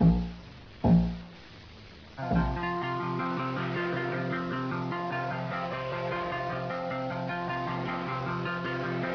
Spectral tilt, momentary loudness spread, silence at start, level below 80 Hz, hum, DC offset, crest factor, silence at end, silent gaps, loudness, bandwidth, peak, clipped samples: -8.5 dB/octave; 17 LU; 0 s; -44 dBFS; none; under 0.1%; 18 dB; 0 s; none; -31 LUFS; 5.4 kHz; -12 dBFS; under 0.1%